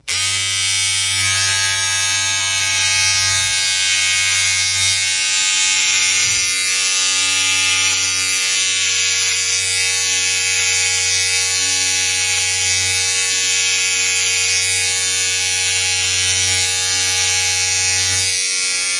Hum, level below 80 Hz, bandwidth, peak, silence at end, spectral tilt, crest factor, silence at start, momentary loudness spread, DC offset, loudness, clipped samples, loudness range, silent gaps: none; -58 dBFS; 11.5 kHz; -2 dBFS; 0 s; 1.5 dB/octave; 14 dB; 0.05 s; 2 LU; under 0.1%; -14 LUFS; under 0.1%; 1 LU; none